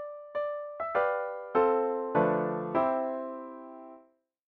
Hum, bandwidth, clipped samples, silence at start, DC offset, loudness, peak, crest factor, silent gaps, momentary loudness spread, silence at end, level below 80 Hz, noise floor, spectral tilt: none; 4.6 kHz; under 0.1%; 0 s; under 0.1%; -30 LUFS; -14 dBFS; 18 dB; none; 16 LU; 0.5 s; -70 dBFS; -62 dBFS; -9.5 dB/octave